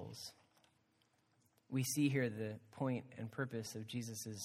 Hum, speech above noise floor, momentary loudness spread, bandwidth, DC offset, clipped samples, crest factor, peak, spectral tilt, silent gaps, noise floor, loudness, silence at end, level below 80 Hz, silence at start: none; 36 dB; 13 LU; 16 kHz; under 0.1%; under 0.1%; 20 dB; -22 dBFS; -5 dB/octave; none; -77 dBFS; -42 LUFS; 0 s; -82 dBFS; 0 s